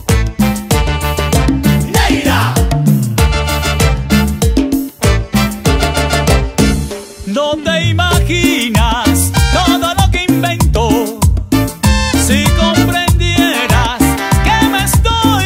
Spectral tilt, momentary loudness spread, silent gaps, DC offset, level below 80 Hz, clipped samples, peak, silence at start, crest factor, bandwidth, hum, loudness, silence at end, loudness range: -4.5 dB/octave; 4 LU; none; under 0.1%; -18 dBFS; under 0.1%; 0 dBFS; 0 s; 12 dB; 16.5 kHz; none; -12 LUFS; 0 s; 2 LU